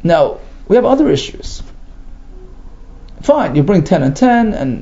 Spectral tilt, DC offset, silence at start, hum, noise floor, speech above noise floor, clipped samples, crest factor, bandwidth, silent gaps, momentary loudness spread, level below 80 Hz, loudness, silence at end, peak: -7 dB/octave; under 0.1%; 0 s; none; -33 dBFS; 21 dB; under 0.1%; 14 dB; 7.8 kHz; none; 18 LU; -32 dBFS; -13 LUFS; 0 s; 0 dBFS